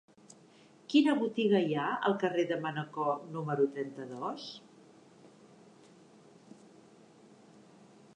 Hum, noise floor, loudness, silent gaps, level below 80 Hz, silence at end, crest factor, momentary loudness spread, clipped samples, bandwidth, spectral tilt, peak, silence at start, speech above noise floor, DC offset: none; -60 dBFS; -32 LUFS; none; -88 dBFS; 2.9 s; 20 dB; 13 LU; under 0.1%; 10 kHz; -6.5 dB/octave; -14 dBFS; 0.9 s; 29 dB; under 0.1%